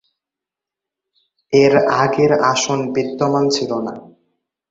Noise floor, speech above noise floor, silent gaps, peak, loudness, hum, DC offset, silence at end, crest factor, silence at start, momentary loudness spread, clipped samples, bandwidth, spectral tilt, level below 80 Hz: -86 dBFS; 71 dB; none; -2 dBFS; -16 LUFS; none; under 0.1%; 0.7 s; 16 dB; 1.5 s; 10 LU; under 0.1%; 7.8 kHz; -4.5 dB/octave; -58 dBFS